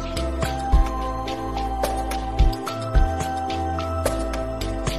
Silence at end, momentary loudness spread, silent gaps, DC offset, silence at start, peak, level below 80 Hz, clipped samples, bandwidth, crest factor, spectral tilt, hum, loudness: 0 s; 5 LU; none; 0.5%; 0 s; -6 dBFS; -24 dBFS; under 0.1%; 14 kHz; 16 dB; -5.5 dB/octave; none; -25 LUFS